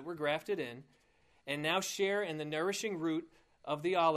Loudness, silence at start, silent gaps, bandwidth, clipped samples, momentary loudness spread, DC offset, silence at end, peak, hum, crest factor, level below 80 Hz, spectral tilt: -36 LUFS; 0 s; none; 15 kHz; under 0.1%; 10 LU; under 0.1%; 0 s; -16 dBFS; none; 20 dB; -76 dBFS; -4 dB/octave